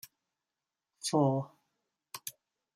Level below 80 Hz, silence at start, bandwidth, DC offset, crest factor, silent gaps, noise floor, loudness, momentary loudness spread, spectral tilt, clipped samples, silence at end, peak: -80 dBFS; 1.05 s; 16 kHz; under 0.1%; 22 dB; none; under -90 dBFS; -33 LUFS; 19 LU; -5.5 dB/octave; under 0.1%; 0.45 s; -16 dBFS